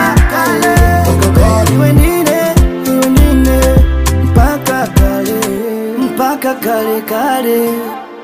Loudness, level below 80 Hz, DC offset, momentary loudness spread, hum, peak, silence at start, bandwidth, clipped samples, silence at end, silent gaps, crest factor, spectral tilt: -11 LUFS; -16 dBFS; under 0.1%; 6 LU; none; 0 dBFS; 0 s; 16.5 kHz; 0.2%; 0 s; none; 10 dB; -6 dB/octave